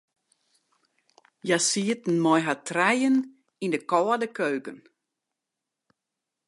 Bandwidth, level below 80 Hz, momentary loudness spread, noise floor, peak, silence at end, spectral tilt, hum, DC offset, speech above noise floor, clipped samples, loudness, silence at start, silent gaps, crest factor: 11.5 kHz; -82 dBFS; 12 LU; -86 dBFS; -8 dBFS; 1.7 s; -4 dB/octave; none; under 0.1%; 61 dB; under 0.1%; -25 LUFS; 1.45 s; none; 20 dB